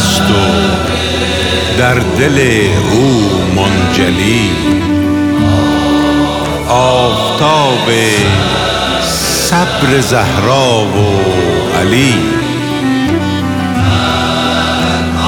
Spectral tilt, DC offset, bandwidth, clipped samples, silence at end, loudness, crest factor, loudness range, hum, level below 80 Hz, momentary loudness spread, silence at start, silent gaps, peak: -4.5 dB/octave; under 0.1%; 19 kHz; under 0.1%; 0 s; -10 LUFS; 10 dB; 2 LU; none; -28 dBFS; 3 LU; 0 s; none; 0 dBFS